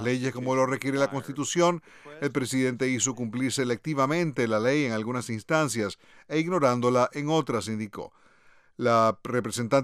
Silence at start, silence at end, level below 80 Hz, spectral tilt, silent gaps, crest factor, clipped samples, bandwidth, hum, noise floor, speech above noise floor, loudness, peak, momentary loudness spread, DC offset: 0 s; 0 s; -70 dBFS; -5 dB/octave; none; 18 dB; under 0.1%; 15.5 kHz; none; -58 dBFS; 32 dB; -27 LUFS; -8 dBFS; 9 LU; under 0.1%